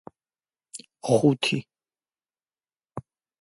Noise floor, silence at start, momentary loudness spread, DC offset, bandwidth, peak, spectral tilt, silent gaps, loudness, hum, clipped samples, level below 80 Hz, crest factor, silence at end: under -90 dBFS; 0.75 s; 22 LU; under 0.1%; 11.5 kHz; -6 dBFS; -5.5 dB/octave; none; -24 LUFS; none; under 0.1%; -68 dBFS; 22 dB; 0.4 s